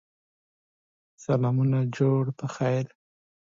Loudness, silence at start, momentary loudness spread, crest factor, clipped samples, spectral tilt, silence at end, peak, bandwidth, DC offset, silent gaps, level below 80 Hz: -26 LUFS; 1.2 s; 8 LU; 18 dB; under 0.1%; -8.5 dB/octave; 0.75 s; -10 dBFS; 7.6 kHz; under 0.1%; none; -70 dBFS